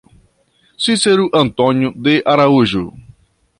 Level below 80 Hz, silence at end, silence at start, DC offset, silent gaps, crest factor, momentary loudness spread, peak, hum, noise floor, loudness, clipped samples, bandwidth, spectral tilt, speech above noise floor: -48 dBFS; 0.6 s; 0.8 s; under 0.1%; none; 14 dB; 7 LU; -2 dBFS; none; -57 dBFS; -14 LUFS; under 0.1%; 11.5 kHz; -5 dB/octave; 44 dB